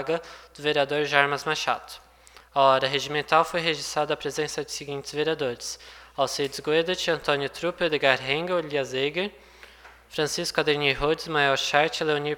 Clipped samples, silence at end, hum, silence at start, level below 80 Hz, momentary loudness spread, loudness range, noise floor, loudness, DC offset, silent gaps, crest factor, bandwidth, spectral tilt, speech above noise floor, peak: under 0.1%; 0 s; none; 0 s; -54 dBFS; 11 LU; 4 LU; -53 dBFS; -25 LUFS; under 0.1%; none; 24 dB; 18 kHz; -3 dB/octave; 27 dB; -2 dBFS